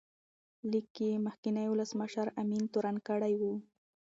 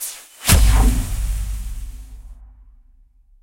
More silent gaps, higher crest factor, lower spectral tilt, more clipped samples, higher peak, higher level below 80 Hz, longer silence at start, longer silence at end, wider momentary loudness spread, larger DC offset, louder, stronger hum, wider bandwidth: first, 0.90-0.95 s, 1.38-1.43 s vs none; about the same, 16 dB vs 20 dB; first, -6.5 dB/octave vs -3.5 dB/octave; neither; second, -20 dBFS vs 0 dBFS; second, -82 dBFS vs -20 dBFS; first, 0.65 s vs 0 s; second, 0.5 s vs 1 s; second, 4 LU vs 23 LU; neither; second, -35 LUFS vs -19 LUFS; neither; second, 7.8 kHz vs 16.5 kHz